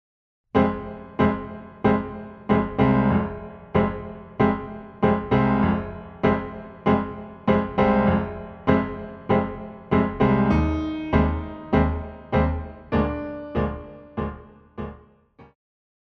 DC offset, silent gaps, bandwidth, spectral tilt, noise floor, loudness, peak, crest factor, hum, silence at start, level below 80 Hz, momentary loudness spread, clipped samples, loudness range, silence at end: under 0.1%; none; 6 kHz; -9.5 dB/octave; -52 dBFS; -23 LUFS; -2 dBFS; 22 dB; none; 0.55 s; -36 dBFS; 15 LU; under 0.1%; 4 LU; 0.6 s